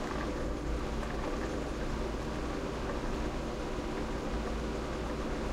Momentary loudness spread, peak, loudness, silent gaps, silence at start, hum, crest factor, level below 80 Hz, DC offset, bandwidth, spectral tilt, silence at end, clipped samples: 1 LU; -22 dBFS; -37 LUFS; none; 0 s; none; 12 dB; -40 dBFS; under 0.1%; 14 kHz; -6 dB/octave; 0 s; under 0.1%